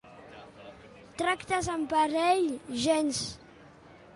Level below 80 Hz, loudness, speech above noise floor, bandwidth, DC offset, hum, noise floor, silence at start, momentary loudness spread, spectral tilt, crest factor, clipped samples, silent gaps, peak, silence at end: -58 dBFS; -29 LUFS; 25 dB; 11.5 kHz; under 0.1%; none; -53 dBFS; 0.05 s; 23 LU; -3.5 dB/octave; 18 dB; under 0.1%; none; -12 dBFS; 0.2 s